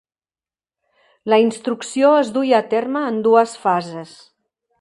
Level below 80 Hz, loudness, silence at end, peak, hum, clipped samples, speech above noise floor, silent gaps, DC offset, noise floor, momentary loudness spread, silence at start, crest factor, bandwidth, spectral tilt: -72 dBFS; -17 LUFS; 0.75 s; 0 dBFS; none; under 0.1%; over 73 dB; none; under 0.1%; under -90 dBFS; 10 LU; 1.25 s; 18 dB; 11.5 kHz; -5 dB/octave